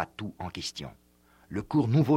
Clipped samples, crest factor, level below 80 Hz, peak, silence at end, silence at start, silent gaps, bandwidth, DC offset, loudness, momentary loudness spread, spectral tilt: under 0.1%; 16 dB; -58 dBFS; -12 dBFS; 0 s; 0 s; none; 15 kHz; under 0.1%; -31 LUFS; 15 LU; -7 dB/octave